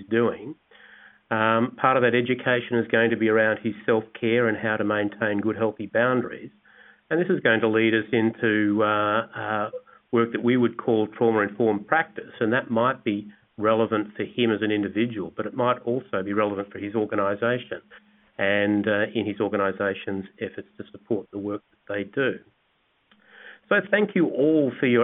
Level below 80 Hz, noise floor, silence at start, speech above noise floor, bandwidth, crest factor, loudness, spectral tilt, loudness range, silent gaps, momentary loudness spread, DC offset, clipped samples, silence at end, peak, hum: -70 dBFS; -68 dBFS; 0 s; 44 dB; 3.9 kHz; 20 dB; -24 LUFS; -10.5 dB/octave; 5 LU; none; 11 LU; under 0.1%; under 0.1%; 0 s; -4 dBFS; none